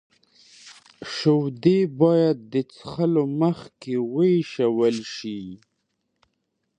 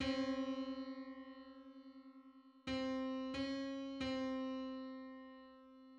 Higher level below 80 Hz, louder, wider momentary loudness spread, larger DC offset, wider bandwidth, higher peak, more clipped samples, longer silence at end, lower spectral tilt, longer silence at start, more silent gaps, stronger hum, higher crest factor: about the same, -66 dBFS vs -68 dBFS; first, -22 LUFS vs -44 LUFS; second, 14 LU vs 18 LU; neither; first, 9.4 kHz vs 8.2 kHz; first, -6 dBFS vs -28 dBFS; neither; first, 1.25 s vs 0 s; first, -7.5 dB/octave vs -5 dB/octave; first, 0.65 s vs 0 s; neither; neither; about the same, 18 dB vs 16 dB